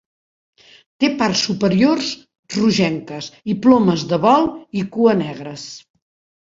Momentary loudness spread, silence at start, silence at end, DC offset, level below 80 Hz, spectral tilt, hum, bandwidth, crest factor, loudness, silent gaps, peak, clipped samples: 16 LU; 1 s; 0.7 s; under 0.1%; -56 dBFS; -5.5 dB/octave; none; 7.8 kHz; 18 dB; -17 LUFS; 2.39-2.43 s; 0 dBFS; under 0.1%